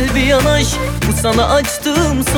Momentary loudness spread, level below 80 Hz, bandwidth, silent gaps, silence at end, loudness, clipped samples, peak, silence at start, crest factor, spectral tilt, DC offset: 5 LU; -22 dBFS; over 20 kHz; none; 0 s; -14 LUFS; under 0.1%; -2 dBFS; 0 s; 12 dB; -4.5 dB/octave; under 0.1%